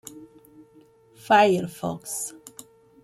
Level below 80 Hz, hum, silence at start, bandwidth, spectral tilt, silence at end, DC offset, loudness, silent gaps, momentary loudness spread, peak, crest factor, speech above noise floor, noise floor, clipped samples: -68 dBFS; none; 0.15 s; 15.5 kHz; -4 dB/octave; 0.7 s; under 0.1%; -23 LUFS; none; 26 LU; -6 dBFS; 20 dB; 33 dB; -55 dBFS; under 0.1%